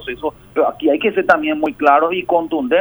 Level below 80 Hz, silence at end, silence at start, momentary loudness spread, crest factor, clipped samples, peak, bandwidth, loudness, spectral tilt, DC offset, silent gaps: -50 dBFS; 0 s; 0 s; 8 LU; 16 dB; under 0.1%; 0 dBFS; over 20 kHz; -16 LUFS; -6 dB/octave; under 0.1%; none